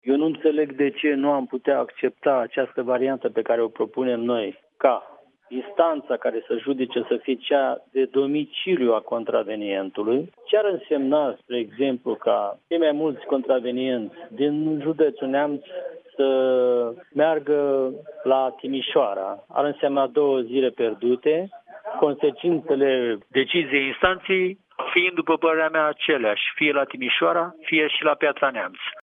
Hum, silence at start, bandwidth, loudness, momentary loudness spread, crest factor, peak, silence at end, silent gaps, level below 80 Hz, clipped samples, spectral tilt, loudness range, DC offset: none; 0.05 s; 4.6 kHz; -23 LUFS; 7 LU; 20 dB; -2 dBFS; 0 s; none; -66 dBFS; under 0.1%; -8 dB/octave; 3 LU; under 0.1%